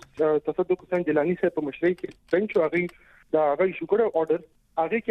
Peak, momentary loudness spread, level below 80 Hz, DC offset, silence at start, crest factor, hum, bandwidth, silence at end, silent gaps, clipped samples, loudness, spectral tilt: -10 dBFS; 5 LU; -62 dBFS; under 0.1%; 0.15 s; 14 dB; none; 6.2 kHz; 0 s; none; under 0.1%; -25 LUFS; -8.5 dB/octave